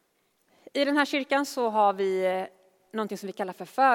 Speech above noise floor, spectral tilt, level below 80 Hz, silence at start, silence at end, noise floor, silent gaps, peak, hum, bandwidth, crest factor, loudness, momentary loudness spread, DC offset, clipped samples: 45 dB; -4 dB/octave; -82 dBFS; 0.75 s; 0 s; -71 dBFS; none; -8 dBFS; none; 17 kHz; 18 dB; -27 LUFS; 11 LU; under 0.1%; under 0.1%